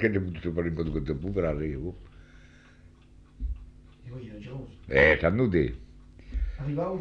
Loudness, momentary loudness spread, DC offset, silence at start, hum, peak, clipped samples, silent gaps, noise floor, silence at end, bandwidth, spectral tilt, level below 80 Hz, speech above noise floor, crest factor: -28 LUFS; 21 LU; under 0.1%; 0 s; none; -8 dBFS; under 0.1%; none; -54 dBFS; 0 s; 7.4 kHz; -8.5 dB/octave; -40 dBFS; 27 dB; 22 dB